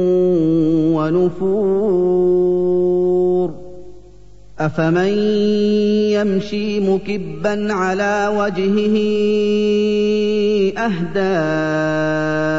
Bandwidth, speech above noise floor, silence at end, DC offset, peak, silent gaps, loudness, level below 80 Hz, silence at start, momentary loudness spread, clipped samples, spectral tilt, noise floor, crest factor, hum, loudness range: 7.8 kHz; 27 dB; 0 s; 2%; -4 dBFS; none; -17 LUFS; -46 dBFS; 0 s; 5 LU; under 0.1%; -7 dB/octave; -44 dBFS; 12 dB; 50 Hz at -45 dBFS; 2 LU